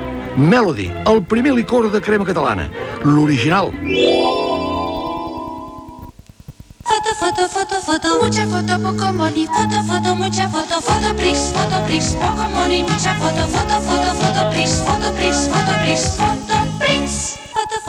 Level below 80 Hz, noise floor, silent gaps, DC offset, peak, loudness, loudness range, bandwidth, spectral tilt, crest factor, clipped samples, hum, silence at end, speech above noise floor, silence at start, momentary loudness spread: -34 dBFS; -39 dBFS; none; under 0.1%; -4 dBFS; -17 LUFS; 4 LU; 16 kHz; -4.5 dB/octave; 14 dB; under 0.1%; none; 0 s; 23 dB; 0 s; 7 LU